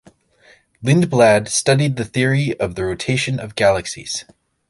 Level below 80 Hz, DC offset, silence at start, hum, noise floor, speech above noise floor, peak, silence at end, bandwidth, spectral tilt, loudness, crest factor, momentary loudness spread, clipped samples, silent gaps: -46 dBFS; under 0.1%; 0.8 s; none; -52 dBFS; 35 dB; -2 dBFS; 0.5 s; 11.5 kHz; -5 dB/octave; -18 LUFS; 16 dB; 12 LU; under 0.1%; none